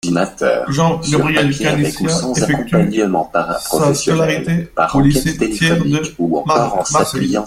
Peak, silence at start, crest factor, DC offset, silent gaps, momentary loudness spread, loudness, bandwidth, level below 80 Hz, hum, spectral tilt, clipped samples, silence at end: 0 dBFS; 0.05 s; 14 dB; under 0.1%; none; 4 LU; -15 LUFS; 15.5 kHz; -36 dBFS; none; -5 dB/octave; under 0.1%; 0 s